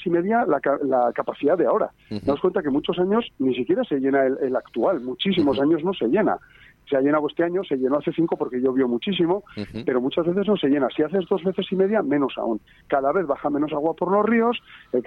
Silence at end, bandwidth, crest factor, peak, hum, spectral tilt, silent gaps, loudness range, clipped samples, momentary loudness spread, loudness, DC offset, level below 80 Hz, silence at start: 0.05 s; 5.2 kHz; 14 dB; -8 dBFS; none; -8.5 dB/octave; none; 1 LU; under 0.1%; 5 LU; -22 LUFS; under 0.1%; -58 dBFS; 0 s